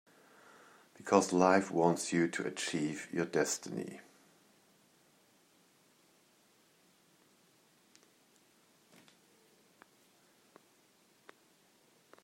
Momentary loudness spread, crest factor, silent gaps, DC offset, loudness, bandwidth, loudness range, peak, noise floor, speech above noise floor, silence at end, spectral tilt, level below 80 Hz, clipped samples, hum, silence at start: 15 LU; 26 dB; none; under 0.1%; -32 LUFS; 16 kHz; 12 LU; -12 dBFS; -69 dBFS; 37 dB; 8.2 s; -4.5 dB/octave; -82 dBFS; under 0.1%; none; 1 s